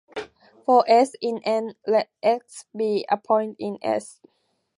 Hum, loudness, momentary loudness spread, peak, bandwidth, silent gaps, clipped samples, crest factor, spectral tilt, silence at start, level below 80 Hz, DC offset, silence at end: none; -23 LUFS; 13 LU; -4 dBFS; 11.5 kHz; none; under 0.1%; 18 dB; -4.5 dB/octave; 0.15 s; -74 dBFS; under 0.1%; 0.7 s